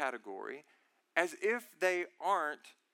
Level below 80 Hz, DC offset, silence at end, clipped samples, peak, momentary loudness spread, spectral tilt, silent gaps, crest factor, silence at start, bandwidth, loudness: under -90 dBFS; under 0.1%; 0.25 s; under 0.1%; -14 dBFS; 13 LU; -2.5 dB/octave; none; 22 dB; 0 s; 17 kHz; -35 LUFS